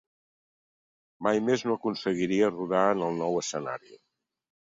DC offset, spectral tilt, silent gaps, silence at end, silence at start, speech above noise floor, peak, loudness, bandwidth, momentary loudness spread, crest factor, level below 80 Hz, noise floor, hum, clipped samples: under 0.1%; -5 dB/octave; none; 0.7 s; 1.2 s; over 63 dB; -10 dBFS; -28 LUFS; 7.8 kHz; 8 LU; 18 dB; -70 dBFS; under -90 dBFS; none; under 0.1%